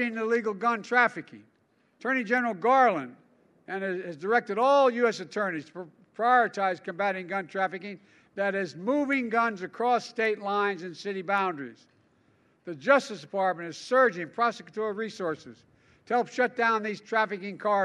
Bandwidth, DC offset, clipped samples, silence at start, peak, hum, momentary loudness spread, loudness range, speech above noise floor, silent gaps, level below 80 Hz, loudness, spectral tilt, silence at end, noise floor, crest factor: 11 kHz; under 0.1%; under 0.1%; 0 s; -8 dBFS; none; 13 LU; 4 LU; 40 dB; none; -82 dBFS; -27 LUFS; -5 dB/octave; 0 s; -68 dBFS; 20 dB